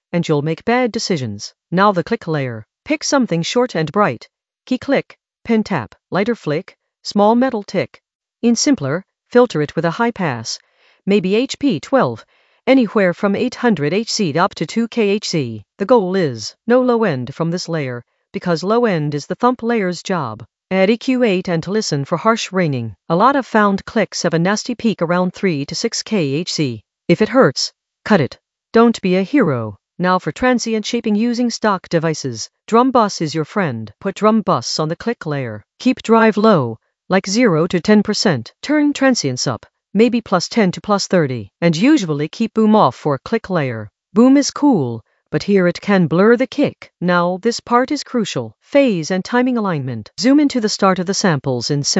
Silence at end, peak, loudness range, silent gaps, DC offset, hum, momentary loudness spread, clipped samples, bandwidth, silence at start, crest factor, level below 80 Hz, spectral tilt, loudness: 0 s; 0 dBFS; 3 LU; 8.15-8.20 s; under 0.1%; none; 10 LU; under 0.1%; 8.2 kHz; 0.15 s; 16 dB; -56 dBFS; -5.5 dB/octave; -17 LUFS